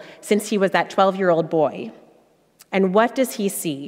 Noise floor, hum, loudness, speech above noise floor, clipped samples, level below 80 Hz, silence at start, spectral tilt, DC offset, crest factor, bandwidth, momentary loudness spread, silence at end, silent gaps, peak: -57 dBFS; none; -20 LUFS; 37 dB; under 0.1%; -72 dBFS; 0 s; -5 dB/octave; under 0.1%; 18 dB; 16 kHz; 6 LU; 0 s; none; -4 dBFS